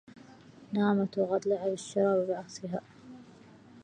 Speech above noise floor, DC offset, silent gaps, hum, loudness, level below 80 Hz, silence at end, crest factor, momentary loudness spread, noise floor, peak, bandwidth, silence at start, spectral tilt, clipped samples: 25 dB; under 0.1%; none; none; -31 LUFS; -74 dBFS; 0 s; 18 dB; 23 LU; -54 dBFS; -14 dBFS; 9.8 kHz; 0.15 s; -6.5 dB/octave; under 0.1%